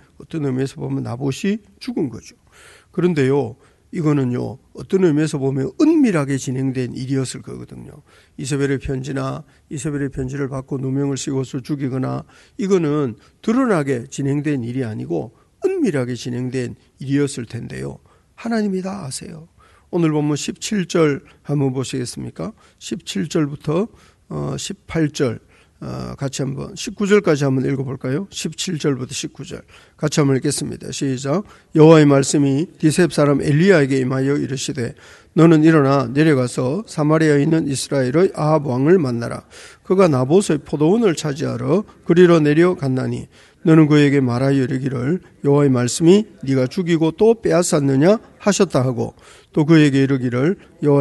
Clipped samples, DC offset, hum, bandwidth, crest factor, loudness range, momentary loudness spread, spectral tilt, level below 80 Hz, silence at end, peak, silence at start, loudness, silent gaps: under 0.1%; under 0.1%; none; 12 kHz; 18 dB; 8 LU; 15 LU; -6.5 dB/octave; -50 dBFS; 0 s; 0 dBFS; 0.2 s; -18 LUFS; none